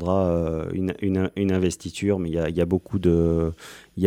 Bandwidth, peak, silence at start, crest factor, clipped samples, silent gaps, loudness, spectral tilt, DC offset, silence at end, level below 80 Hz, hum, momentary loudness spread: 14.5 kHz; -6 dBFS; 0 s; 18 dB; under 0.1%; none; -24 LUFS; -7.5 dB/octave; under 0.1%; 0 s; -46 dBFS; none; 6 LU